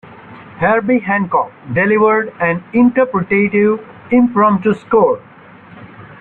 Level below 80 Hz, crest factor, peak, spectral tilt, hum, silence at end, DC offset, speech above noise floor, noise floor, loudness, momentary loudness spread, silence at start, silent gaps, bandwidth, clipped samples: -52 dBFS; 12 dB; -2 dBFS; -10 dB/octave; none; 0.05 s; under 0.1%; 26 dB; -39 dBFS; -14 LUFS; 6 LU; 0.1 s; none; 4.1 kHz; under 0.1%